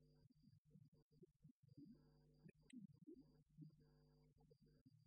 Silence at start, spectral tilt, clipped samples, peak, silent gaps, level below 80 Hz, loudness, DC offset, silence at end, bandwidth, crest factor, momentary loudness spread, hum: 0 s; -8 dB/octave; under 0.1%; -50 dBFS; 0.58-0.65 s, 0.88-0.92 s, 1.02-1.11 s, 1.51-1.63 s, 4.81-4.86 s; -86 dBFS; -67 LUFS; under 0.1%; 0 s; 5 kHz; 18 dB; 4 LU; none